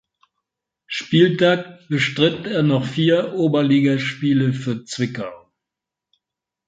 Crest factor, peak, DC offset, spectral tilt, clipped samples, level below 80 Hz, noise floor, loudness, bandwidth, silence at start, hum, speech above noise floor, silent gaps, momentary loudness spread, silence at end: 18 dB; -2 dBFS; under 0.1%; -6.5 dB/octave; under 0.1%; -62 dBFS; -85 dBFS; -19 LUFS; 9.2 kHz; 0.9 s; none; 67 dB; none; 10 LU; 1.3 s